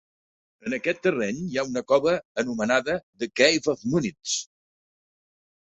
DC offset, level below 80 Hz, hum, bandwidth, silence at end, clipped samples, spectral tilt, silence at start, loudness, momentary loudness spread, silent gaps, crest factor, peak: under 0.1%; -62 dBFS; none; 8.4 kHz; 1.15 s; under 0.1%; -3.5 dB/octave; 0.65 s; -25 LUFS; 10 LU; 2.25-2.35 s, 3.03-3.13 s; 22 dB; -4 dBFS